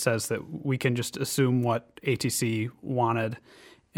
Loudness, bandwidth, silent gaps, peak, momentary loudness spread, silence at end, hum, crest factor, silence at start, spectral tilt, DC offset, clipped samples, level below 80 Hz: -28 LUFS; 17.5 kHz; none; -10 dBFS; 7 LU; 0.6 s; none; 18 dB; 0 s; -5 dB/octave; under 0.1%; under 0.1%; -66 dBFS